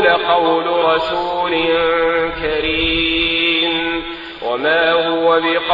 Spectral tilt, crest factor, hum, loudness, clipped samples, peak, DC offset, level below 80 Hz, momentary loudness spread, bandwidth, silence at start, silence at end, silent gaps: -6 dB/octave; 14 dB; none; -15 LUFS; under 0.1%; -2 dBFS; under 0.1%; -38 dBFS; 5 LU; 7.4 kHz; 0 s; 0 s; none